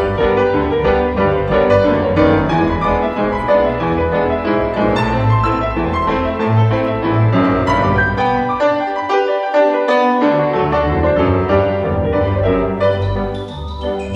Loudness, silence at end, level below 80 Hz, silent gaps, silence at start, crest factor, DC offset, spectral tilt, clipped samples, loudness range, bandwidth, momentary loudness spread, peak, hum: -15 LUFS; 0 s; -30 dBFS; none; 0 s; 14 dB; under 0.1%; -8 dB/octave; under 0.1%; 1 LU; 8 kHz; 4 LU; 0 dBFS; none